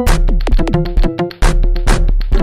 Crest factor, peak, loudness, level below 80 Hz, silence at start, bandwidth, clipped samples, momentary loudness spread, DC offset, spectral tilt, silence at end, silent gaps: 8 dB; -2 dBFS; -16 LUFS; -12 dBFS; 0 s; 14 kHz; under 0.1%; 2 LU; under 0.1%; -6 dB/octave; 0 s; none